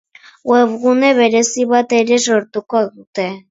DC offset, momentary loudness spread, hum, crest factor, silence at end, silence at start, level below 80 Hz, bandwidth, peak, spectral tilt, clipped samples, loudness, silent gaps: under 0.1%; 11 LU; none; 14 dB; 0.1 s; 0.45 s; -66 dBFS; 8 kHz; 0 dBFS; -3 dB/octave; under 0.1%; -14 LUFS; 3.07-3.13 s